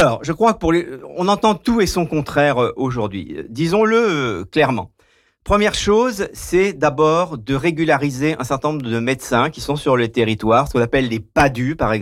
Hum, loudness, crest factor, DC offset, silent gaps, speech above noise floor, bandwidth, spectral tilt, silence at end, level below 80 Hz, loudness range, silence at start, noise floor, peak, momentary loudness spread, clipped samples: none; -18 LUFS; 12 dB; under 0.1%; none; 41 dB; 16 kHz; -5.5 dB/octave; 0 s; -38 dBFS; 1 LU; 0 s; -58 dBFS; -6 dBFS; 6 LU; under 0.1%